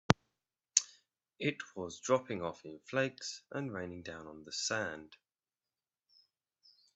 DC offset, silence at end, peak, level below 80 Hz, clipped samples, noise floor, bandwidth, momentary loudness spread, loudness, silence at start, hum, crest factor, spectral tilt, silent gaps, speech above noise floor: under 0.1%; 1.8 s; -2 dBFS; -68 dBFS; under 0.1%; under -90 dBFS; 8.4 kHz; 15 LU; -37 LUFS; 0.1 s; none; 38 dB; -3.5 dB/octave; none; over 51 dB